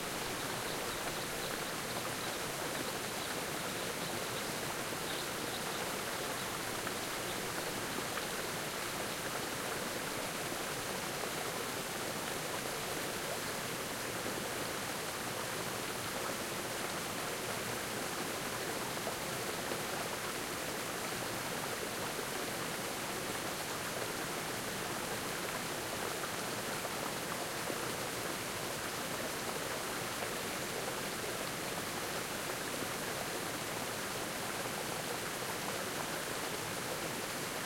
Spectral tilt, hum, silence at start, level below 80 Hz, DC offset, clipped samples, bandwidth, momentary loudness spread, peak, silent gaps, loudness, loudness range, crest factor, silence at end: -2.5 dB/octave; none; 0 s; -64 dBFS; under 0.1%; under 0.1%; 16.5 kHz; 1 LU; -22 dBFS; none; -38 LUFS; 0 LU; 18 dB; 0 s